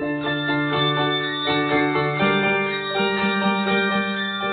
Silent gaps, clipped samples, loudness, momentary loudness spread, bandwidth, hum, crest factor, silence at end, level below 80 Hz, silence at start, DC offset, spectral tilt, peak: none; under 0.1%; -21 LUFS; 4 LU; 4.7 kHz; none; 14 dB; 0 s; -56 dBFS; 0 s; under 0.1%; -9.5 dB/octave; -8 dBFS